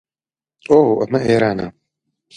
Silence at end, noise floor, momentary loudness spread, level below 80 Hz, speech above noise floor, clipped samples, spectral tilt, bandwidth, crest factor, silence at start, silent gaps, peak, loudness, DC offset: 0.65 s; under -90 dBFS; 12 LU; -50 dBFS; over 75 dB; under 0.1%; -7.5 dB/octave; 10 kHz; 18 dB; 0.7 s; none; 0 dBFS; -16 LUFS; under 0.1%